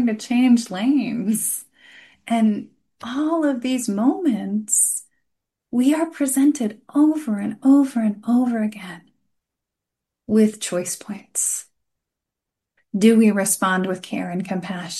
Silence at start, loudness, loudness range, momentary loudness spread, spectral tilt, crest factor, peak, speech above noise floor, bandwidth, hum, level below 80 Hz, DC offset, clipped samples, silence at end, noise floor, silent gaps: 0 s; -20 LUFS; 5 LU; 11 LU; -4.5 dB/octave; 18 dB; -4 dBFS; 65 dB; 12.5 kHz; none; -68 dBFS; under 0.1%; under 0.1%; 0 s; -84 dBFS; none